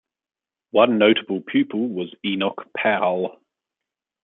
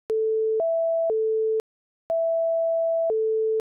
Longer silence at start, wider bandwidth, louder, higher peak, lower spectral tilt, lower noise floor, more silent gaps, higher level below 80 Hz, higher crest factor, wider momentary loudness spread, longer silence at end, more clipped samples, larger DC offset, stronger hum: first, 0.75 s vs 0.1 s; first, 4.1 kHz vs 1.5 kHz; first, -21 LUFS vs -24 LUFS; first, -2 dBFS vs -20 dBFS; first, -9.5 dB/octave vs 9.5 dB/octave; about the same, under -90 dBFS vs under -90 dBFS; second, none vs 1.60-2.10 s; about the same, -70 dBFS vs -72 dBFS; first, 20 dB vs 4 dB; first, 10 LU vs 3 LU; first, 0.9 s vs 0.1 s; neither; neither; second, none vs 60 Hz at -85 dBFS